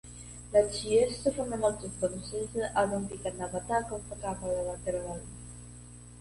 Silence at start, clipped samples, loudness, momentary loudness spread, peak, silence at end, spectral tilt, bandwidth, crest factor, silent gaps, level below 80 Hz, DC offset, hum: 0.05 s; under 0.1%; -31 LUFS; 18 LU; -12 dBFS; 0 s; -4.5 dB/octave; 11.5 kHz; 20 dB; none; -50 dBFS; under 0.1%; 60 Hz at -45 dBFS